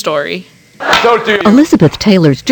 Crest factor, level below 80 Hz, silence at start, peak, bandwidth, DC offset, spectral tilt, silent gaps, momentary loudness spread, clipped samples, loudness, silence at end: 10 dB; -40 dBFS; 0 s; 0 dBFS; 19.5 kHz; under 0.1%; -5.5 dB/octave; none; 13 LU; 1%; -9 LUFS; 0 s